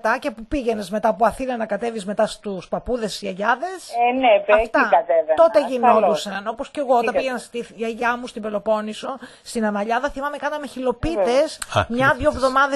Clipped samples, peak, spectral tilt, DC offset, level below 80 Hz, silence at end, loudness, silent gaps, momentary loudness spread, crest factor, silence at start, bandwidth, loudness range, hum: under 0.1%; -2 dBFS; -4.5 dB/octave; under 0.1%; -44 dBFS; 0 s; -21 LUFS; none; 12 LU; 20 dB; 0.05 s; 12.5 kHz; 7 LU; none